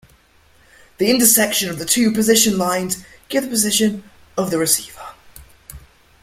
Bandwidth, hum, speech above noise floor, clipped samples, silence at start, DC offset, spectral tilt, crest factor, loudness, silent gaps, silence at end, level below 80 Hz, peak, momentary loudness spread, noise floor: 16.5 kHz; none; 36 dB; under 0.1%; 1 s; under 0.1%; -2.5 dB/octave; 20 dB; -16 LUFS; none; 0.45 s; -52 dBFS; 0 dBFS; 16 LU; -53 dBFS